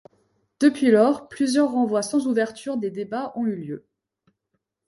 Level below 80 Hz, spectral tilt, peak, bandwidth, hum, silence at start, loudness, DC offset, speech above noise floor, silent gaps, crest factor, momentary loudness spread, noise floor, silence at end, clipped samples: -70 dBFS; -5 dB/octave; -6 dBFS; 11.5 kHz; none; 0.6 s; -22 LUFS; under 0.1%; 56 dB; none; 18 dB; 12 LU; -77 dBFS; 1.1 s; under 0.1%